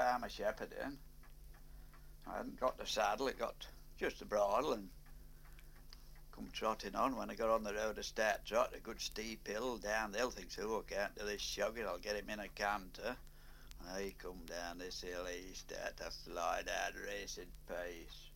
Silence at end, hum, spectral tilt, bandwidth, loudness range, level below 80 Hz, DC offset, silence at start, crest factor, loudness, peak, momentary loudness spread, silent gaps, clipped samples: 0 s; none; -3 dB/octave; 16.5 kHz; 5 LU; -56 dBFS; under 0.1%; 0 s; 22 dB; -41 LUFS; -20 dBFS; 23 LU; none; under 0.1%